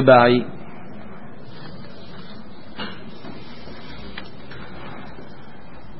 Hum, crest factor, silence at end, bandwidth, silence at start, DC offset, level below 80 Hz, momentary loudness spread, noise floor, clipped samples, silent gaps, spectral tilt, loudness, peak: none; 24 dB; 1 s; 5.8 kHz; 0 s; 3%; -52 dBFS; 20 LU; -42 dBFS; under 0.1%; none; -10.5 dB/octave; -19 LUFS; 0 dBFS